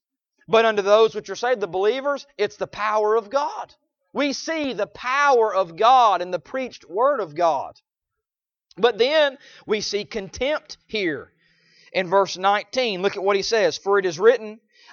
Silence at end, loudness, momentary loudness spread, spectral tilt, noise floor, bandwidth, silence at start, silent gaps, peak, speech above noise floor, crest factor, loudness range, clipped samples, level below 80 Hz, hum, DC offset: 0.35 s; -21 LUFS; 11 LU; -3.5 dB/octave; -89 dBFS; 7.2 kHz; 0.5 s; none; -2 dBFS; 68 dB; 20 dB; 4 LU; under 0.1%; -60 dBFS; none; under 0.1%